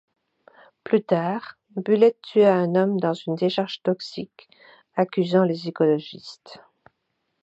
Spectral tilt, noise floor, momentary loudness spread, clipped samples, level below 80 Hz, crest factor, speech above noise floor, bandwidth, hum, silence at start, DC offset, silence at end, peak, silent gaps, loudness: -7.5 dB/octave; -76 dBFS; 19 LU; under 0.1%; -74 dBFS; 18 dB; 53 dB; 8 kHz; none; 0.85 s; under 0.1%; 0.85 s; -4 dBFS; none; -22 LUFS